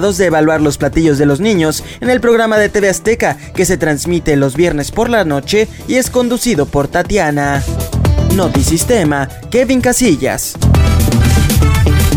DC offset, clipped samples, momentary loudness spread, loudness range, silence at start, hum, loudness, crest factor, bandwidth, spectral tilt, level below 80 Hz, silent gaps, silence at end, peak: under 0.1%; under 0.1%; 5 LU; 2 LU; 0 s; none; -12 LUFS; 10 dB; 18 kHz; -5.5 dB/octave; -22 dBFS; none; 0 s; 0 dBFS